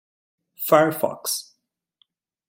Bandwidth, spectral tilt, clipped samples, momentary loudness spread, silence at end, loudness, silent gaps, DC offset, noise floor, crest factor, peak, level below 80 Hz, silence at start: 17 kHz; -3.5 dB/octave; under 0.1%; 11 LU; 1.05 s; -22 LUFS; none; under 0.1%; -72 dBFS; 22 dB; -2 dBFS; -72 dBFS; 0.6 s